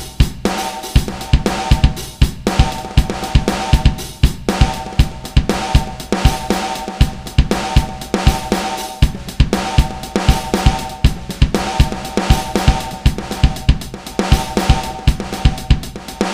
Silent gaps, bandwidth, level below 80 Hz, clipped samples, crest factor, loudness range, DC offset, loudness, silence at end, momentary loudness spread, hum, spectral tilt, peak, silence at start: none; 16 kHz; -18 dBFS; under 0.1%; 16 dB; 1 LU; under 0.1%; -17 LUFS; 0 s; 4 LU; none; -5.5 dB/octave; 0 dBFS; 0 s